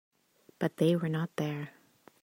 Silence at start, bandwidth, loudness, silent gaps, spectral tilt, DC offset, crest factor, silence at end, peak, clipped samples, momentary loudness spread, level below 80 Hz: 0.6 s; 16 kHz; -32 LUFS; none; -7.5 dB/octave; under 0.1%; 18 dB; 0.5 s; -14 dBFS; under 0.1%; 11 LU; -76 dBFS